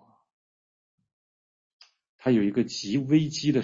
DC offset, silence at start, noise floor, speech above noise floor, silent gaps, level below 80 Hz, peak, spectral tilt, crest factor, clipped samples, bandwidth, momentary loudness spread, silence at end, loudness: under 0.1%; 2.25 s; under -90 dBFS; over 66 dB; none; -66 dBFS; -10 dBFS; -6 dB/octave; 18 dB; under 0.1%; 7.8 kHz; 5 LU; 0 s; -25 LUFS